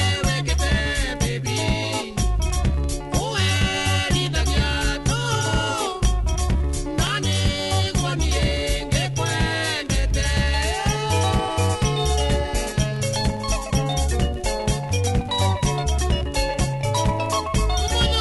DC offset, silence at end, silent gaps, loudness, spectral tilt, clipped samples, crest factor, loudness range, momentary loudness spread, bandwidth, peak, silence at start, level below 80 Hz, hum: under 0.1%; 0 s; none; -22 LUFS; -4 dB/octave; under 0.1%; 16 dB; 1 LU; 3 LU; 12 kHz; -6 dBFS; 0 s; -26 dBFS; none